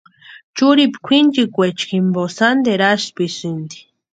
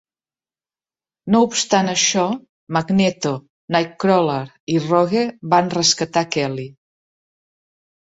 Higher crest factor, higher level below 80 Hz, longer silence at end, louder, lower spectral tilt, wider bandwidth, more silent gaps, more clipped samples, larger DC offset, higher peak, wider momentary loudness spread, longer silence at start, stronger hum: about the same, 16 dB vs 18 dB; about the same, -64 dBFS vs -60 dBFS; second, 0.35 s vs 1.35 s; about the same, -16 LUFS vs -18 LUFS; about the same, -5 dB/octave vs -4 dB/octave; first, 9 kHz vs 8 kHz; second, 0.44-0.54 s vs 2.49-2.67 s, 3.50-3.68 s, 4.60-4.67 s; neither; neither; about the same, 0 dBFS vs -2 dBFS; about the same, 12 LU vs 10 LU; second, 0.3 s vs 1.25 s; neither